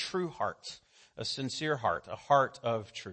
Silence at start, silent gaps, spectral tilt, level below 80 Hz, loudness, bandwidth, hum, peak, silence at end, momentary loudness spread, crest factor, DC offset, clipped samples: 0 s; none; -4.5 dB/octave; -68 dBFS; -32 LUFS; 8.8 kHz; none; -12 dBFS; 0 s; 14 LU; 22 dB; under 0.1%; under 0.1%